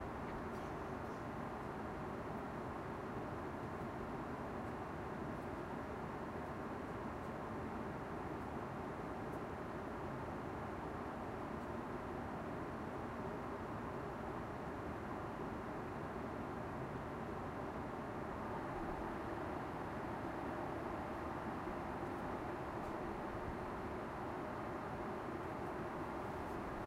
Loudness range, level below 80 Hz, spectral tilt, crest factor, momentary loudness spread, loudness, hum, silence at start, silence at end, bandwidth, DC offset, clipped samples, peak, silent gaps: 1 LU; -60 dBFS; -7 dB/octave; 14 dB; 2 LU; -45 LUFS; none; 0 s; 0 s; 16 kHz; under 0.1%; under 0.1%; -30 dBFS; none